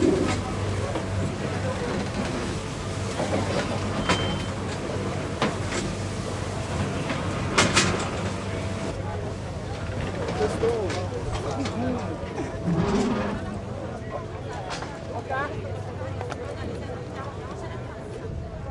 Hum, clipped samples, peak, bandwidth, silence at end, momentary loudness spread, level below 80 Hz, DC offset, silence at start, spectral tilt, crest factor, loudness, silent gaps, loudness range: none; under 0.1%; -4 dBFS; 11.5 kHz; 0 s; 10 LU; -42 dBFS; under 0.1%; 0 s; -5 dB/octave; 22 dB; -28 LUFS; none; 7 LU